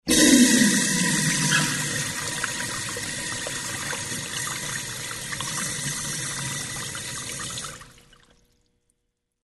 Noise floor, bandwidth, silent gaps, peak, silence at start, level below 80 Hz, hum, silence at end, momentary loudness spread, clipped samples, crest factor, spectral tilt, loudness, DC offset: -77 dBFS; 12.5 kHz; none; -4 dBFS; 0.05 s; -52 dBFS; 60 Hz at -60 dBFS; 1.55 s; 14 LU; under 0.1%; 22 dB; -2.5 dB/octave; -23 LUFS; under 0.1%